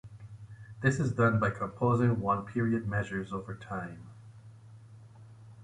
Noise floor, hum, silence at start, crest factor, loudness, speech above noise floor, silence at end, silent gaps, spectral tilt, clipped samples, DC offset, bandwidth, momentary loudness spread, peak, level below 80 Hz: -52 dBFS; none; 0.05 s; 20 dB; -31 LUFS; 22 dB; 0 s; none; -8 dB/octave; under 0.1%; under 0.1%; 10.5 kHz; 22 LU; -12 dBFS; -58 dBFS